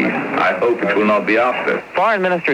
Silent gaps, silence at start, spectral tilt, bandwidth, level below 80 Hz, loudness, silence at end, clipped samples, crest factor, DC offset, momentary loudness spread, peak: none; 0 s; -6.5 dB/octave; 12 kHz; -60 dBFS; -16 LUFS; 0 s; under 0.1%; 12 dB; under 0.1%; 4 LU; -4 dBFS